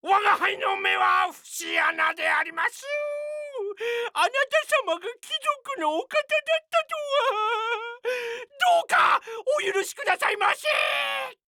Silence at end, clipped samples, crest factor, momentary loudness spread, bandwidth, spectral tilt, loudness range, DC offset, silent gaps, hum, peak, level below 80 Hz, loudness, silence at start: 0.15 s; under 0.1%; 16 dB; 9 LU; 19 kHz; 0 dB/octave; 3 LU; under 0.1%; none; none; -8 dBFS; -78 dBFS; -24 LUFS; 0.05 s